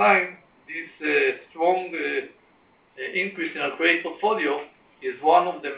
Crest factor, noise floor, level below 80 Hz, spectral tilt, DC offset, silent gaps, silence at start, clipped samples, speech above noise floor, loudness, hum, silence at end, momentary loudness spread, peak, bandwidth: 20 dB; -59 dBFS; -76 dBFS; -7.5 dB/octave; under 0.1%; none; 0 s; under 0.1%; 36 dB; -24 LUFS; none; 0 s; 15 LU; -4 dBFS; 4 kHz